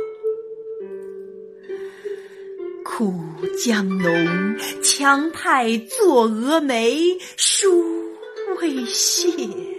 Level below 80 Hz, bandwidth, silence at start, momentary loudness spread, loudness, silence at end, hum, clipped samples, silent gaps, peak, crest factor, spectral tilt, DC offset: -70 dBFS; 15.5 kHz; 0 s; 17 LU; -19 LUFS; 0 s; none; under 0.1%; none; -2 dBFS; 18 dB; -3 dB/octave; under 0.1%